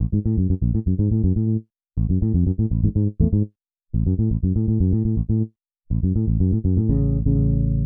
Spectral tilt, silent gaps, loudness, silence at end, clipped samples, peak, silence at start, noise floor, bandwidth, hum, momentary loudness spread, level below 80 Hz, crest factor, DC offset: -18 dB/octave; none; -21 LUFS; 0 s; under 0.1%; -6 dBFS; 0 s; -43 dBFS; 1.3 kHz; none; 5 LU; -28 dBFS; 14 dB; 0.2%